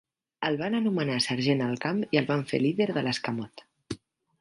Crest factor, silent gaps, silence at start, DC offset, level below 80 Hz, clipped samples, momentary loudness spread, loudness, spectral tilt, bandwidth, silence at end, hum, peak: 20 dB; none; 0.4 s; under 0.1%; -66 dBFS; under 0.1%; 15 LU; -28 LUFS; -5.5 dB/octave; 11.5 kHz; 0.45 s; none; -8 dBFS